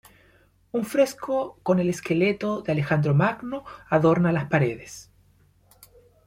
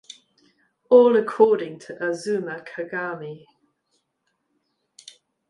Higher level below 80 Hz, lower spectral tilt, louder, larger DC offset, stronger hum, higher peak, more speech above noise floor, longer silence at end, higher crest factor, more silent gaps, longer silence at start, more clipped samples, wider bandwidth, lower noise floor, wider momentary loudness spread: first, -58 dBFS vs -76 dBFS; first, -7 dB/octave vs -5.5 dB/octave; second, -24 LUFS vs -21 LUFS; neither; first, 50 Hz at -55 dBFS vs none; second, -8 dBFS vs -2 dBFS; second, 36 dB vs 54 dB; second, 1.25 s vs 2.1 s; about the same, 18 dB vs 22 dB; neither; second, 0.75 s vs 0.9 s; neither; first, 16.5 kHz vs 11 kHz; second, -60 dBFS vs -75 dBFS; second, 13 LU vs 18 LU